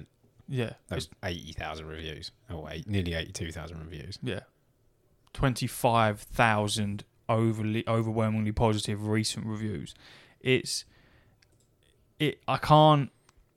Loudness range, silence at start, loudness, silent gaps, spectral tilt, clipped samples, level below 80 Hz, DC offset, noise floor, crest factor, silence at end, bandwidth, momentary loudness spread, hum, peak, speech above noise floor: 9 LU; 0 s; -29 LUFS; none; -5.5 dB/octave; under 0.1%; -50 dBFS; under 0.1%; -67 dBFS; 22 dB; 0.5 s; 15 kHz; 15 LU; none; -8 dBFS; 39 dB